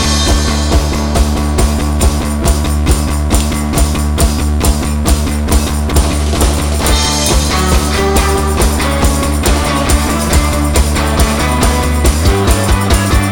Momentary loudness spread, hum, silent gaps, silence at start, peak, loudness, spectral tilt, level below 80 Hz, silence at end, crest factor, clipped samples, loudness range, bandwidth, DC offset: 2 LU; none; none; 0 s; 0 dBFS; -12 LUFS; -4.5 dB/octave; -14 dBFS; 0 s; 10 dB; under 0.1%; 1 LU; 18 kHz; under 0.1%